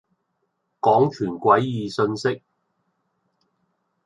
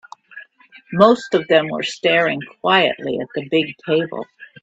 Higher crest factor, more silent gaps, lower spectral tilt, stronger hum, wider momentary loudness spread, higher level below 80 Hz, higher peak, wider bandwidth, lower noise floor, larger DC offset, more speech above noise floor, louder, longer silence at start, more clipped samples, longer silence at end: about the same, 20 dB vs 18 dB; neither; first, -7 dB/octave vs -5 dB/octave; neither; second, 8 LU vs 14 LU; about the same, -64 dBFS vs -64 dBFS; second, -4 dBFS vs 0 dBFS; first, 11 kHz vs 8.4 kHz; first, -74 dBFS vs -47 dBFS; neither; first, 54 dB vs 29 dB; second, -21 LUFS vs -18 LUFS; first, 0.85 s vs 0.35 s; neither; first, 1.7 s vs 0.15 s